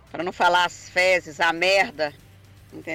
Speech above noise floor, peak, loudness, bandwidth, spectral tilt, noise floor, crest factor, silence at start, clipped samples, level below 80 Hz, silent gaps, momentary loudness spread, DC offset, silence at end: 27 dB; -10 dBFS; -21 LUFS; 16.5 kHz; -2.5 dB/octave; -49 dBFS; 14 dB; 0.15 s; under 0.1%; -58 dBFS; none; 10 LU; under 0.1%; 0 s